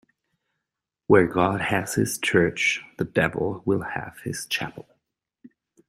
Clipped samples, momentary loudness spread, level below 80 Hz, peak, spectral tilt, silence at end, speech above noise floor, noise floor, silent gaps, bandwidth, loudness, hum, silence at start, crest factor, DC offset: under 0.1%; 13 LU; -56 dBFS; -2 dBFS; -4.5 dB/octave; 0.4 s; 62 dB; -85 dBFS; none; 16 kHz; -23 LUFS; none; 1.1 s; 22 dB; under 0.1%